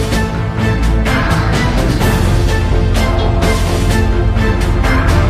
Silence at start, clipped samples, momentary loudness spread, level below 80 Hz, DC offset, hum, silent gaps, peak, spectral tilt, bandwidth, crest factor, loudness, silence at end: 0 s; under 0.1%; 2 LU; -16 dBFS; under 0.1%; none; none; 0 dBFS; -6 dB/octave; 15.5 kHz; 12 dB; -14 LUFS; 0 s